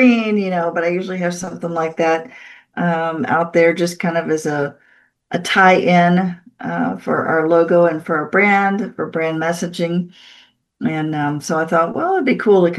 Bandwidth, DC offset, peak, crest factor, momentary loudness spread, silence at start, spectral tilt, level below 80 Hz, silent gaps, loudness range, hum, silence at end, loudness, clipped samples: 12.5 kHz; under 0.1%; 0 dBFS; 16 dB; 11 LU; 0 s; -6 dB/octave; -64 dBFS; none; 5 LU; none; 0 s; -17 LUFS; under 0.1%